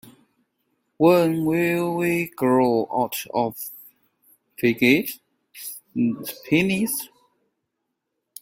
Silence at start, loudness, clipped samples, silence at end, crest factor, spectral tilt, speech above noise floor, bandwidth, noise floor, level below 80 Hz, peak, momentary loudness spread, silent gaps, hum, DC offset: 1 s; -22 LUFS; under 0.1%; 1.35 s; 20 dB; -5.5 dB/octave; 58 dB; 16.5 kHz; -79 dBFS; -62 dBFS; -4 dBFS; 17 LU; none; none; under 0.1%